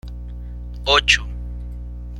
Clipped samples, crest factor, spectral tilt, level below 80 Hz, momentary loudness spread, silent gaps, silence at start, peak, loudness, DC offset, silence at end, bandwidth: under 0.1%; 22 dB; -2 dB/octave; -30 dBFS; 20 LU; none; 0.05 s; -2 dBFS; -17 LUFS; under 0.1%; 0 s; 12.5 kHz